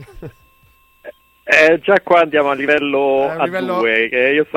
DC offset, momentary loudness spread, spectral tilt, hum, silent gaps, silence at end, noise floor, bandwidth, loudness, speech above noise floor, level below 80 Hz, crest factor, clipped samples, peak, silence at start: under 0.1%; 7 LU; -5 dB/octave; none; none; 0 s; -53 dBFS; 16 kHz; -14 LUFS; 38 dB; -52 dBFS; 16 dB; under 0.1%; 0 dBFS; 0 s